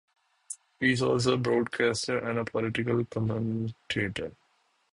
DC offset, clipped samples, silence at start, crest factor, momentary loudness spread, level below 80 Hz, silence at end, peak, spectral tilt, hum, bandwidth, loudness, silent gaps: under 0.1%; under 0.1%; 0.5 s; 20 dB; 12 LU; -58 dBFS; 0.65 s; -10 dBFS; -5.5 dB/octave; none; 11.5 kHz; -29 LUFS; none